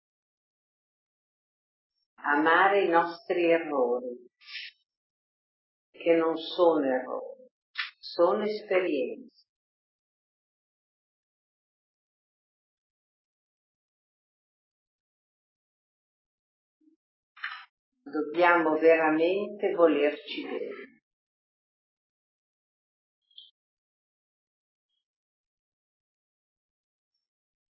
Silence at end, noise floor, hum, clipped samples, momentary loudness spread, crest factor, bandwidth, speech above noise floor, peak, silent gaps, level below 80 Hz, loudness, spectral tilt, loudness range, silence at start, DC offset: 6.9 s; under -90 dBFS; none; under 0.1%; 18 LU; 24 dB; 5.8 kHz; over 64 dB; -8 dBFS; 4.97-5.93 s, 7.51-7.74 s, 9.49-16.80 s, 16.96-17.35 s, 17.69-17.92 s; under -90 dBFS; -26 LUFS; -8 dB/octave; 16 LU; 2.2 s; under 0.1%